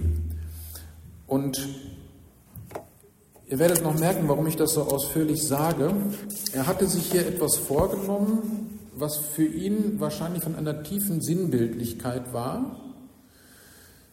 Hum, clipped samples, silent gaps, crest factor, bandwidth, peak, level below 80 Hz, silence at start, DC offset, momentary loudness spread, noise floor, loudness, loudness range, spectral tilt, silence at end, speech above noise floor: none; under 0.1%; none; 24 dB; 16.5 kHz; -4 dBFS; -44 dBFS; 0 s; under 0.1%; 17 LU; -56 dBFS; -26 LUFS; 5 LU; -5 dB/octave; 0.4 s; 30 dB